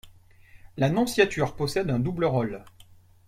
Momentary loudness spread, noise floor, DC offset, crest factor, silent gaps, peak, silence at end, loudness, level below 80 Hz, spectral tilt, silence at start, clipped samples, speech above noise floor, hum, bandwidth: 10 LU; -53 dBFS; under 0.1%; 20 dB; none; -8 dBFS; 0.6 s; -25 LUFS; -52 dBFS; -6 dB/octave; 0.05 s; under 0.1%; 28 dB; none; 16 kHz